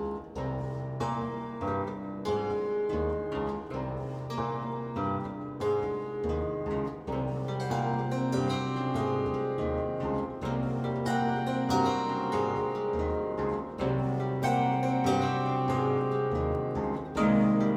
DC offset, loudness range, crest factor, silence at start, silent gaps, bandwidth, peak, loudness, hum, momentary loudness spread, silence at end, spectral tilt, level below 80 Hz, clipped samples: under 0.1%; 4 LU; 16 dB; 0 s; none; 12 kHz; -14 dBFS; -31 LUFS; none; 8 LU; 0 s; -7.5 dB/octave; -48 dBFS; under 0.1%